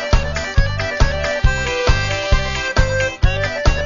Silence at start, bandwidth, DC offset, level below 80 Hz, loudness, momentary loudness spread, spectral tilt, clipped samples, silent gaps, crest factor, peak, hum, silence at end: 0 s; 7.4 kHz; under 0.1%; -18 dBFS; -18 LUFS; 2 LU; -4.5 dB/octave; under 0.1%; none; 14 dB; -2 dBFS; none; 0 s